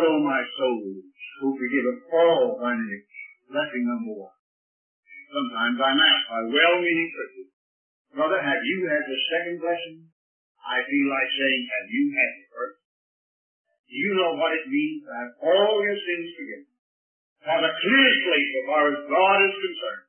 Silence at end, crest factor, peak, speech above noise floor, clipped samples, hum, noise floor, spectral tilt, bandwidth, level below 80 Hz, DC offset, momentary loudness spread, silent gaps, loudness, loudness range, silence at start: 0.1 s; 20 dB; -4 dBFS; over 66 dB; under 0.1%; none; under -90 dBFS; -8 dB/octave; 3.4 kHz; -84 dBFS; under 0.1%; 18 LU; 4.39-5.03 s, 7.53-8.05 s, 10.12-10.55 s, 12.85-13.65 s, 13.79-13.84 s, 16.79-17.36 s; -23 LUFS; 5 LU; 0 s